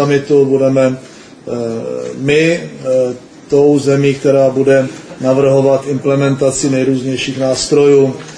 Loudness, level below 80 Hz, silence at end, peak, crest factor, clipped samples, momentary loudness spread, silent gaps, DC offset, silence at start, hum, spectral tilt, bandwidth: -12 LUFS; -48 dBFS; 0 s; 0 dBFS; 12 dB; under 0.1%; 10 LU; none; under 0.1%; 0 s; none; -5.5 dB/octave; 10.5 kHz